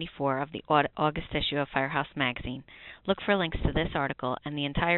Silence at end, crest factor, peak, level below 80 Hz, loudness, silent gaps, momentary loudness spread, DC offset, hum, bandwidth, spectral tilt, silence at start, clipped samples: 0 s; 20 dB; -10 dBFS; -44 dBFS; -29 LUFS; none; 9 LU; under 0.1%; none; 4.3 kHz; -3.5 dB/octave; 0 s; under 0.1%